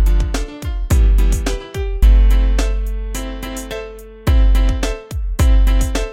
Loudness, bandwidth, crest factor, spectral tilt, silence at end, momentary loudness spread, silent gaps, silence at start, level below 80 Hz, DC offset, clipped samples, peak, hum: -18 LUFS; 15 kHz; 14 dB; -5.5 dB/octave; 0 s; 12 LU; none; 0 s; -14 dBFS; under 0.1%; under 0.1%; 0 dBFS; none